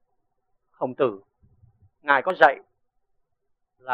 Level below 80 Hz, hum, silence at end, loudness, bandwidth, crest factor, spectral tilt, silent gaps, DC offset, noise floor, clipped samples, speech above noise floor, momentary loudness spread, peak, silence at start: -70 dBFS; none; 0 s; -22 LUFS; 6.4 kHz; 24 dB; -2 dB/octave; none; under 0.1%; -76 dBFS; under 0.1%; 55 dB; 21 LU; -2 dBFS; 0.8 s